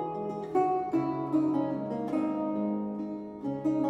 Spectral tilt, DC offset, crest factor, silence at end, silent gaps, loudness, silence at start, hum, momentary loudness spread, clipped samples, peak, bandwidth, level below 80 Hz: -9 dB/octave; under 0.1%; 16 dB; 0 s; none; -31 LUFS; 0 s; none; 8 LU; under 0.1%; -14 dBFS; 7.6 kHz; -68 dBFS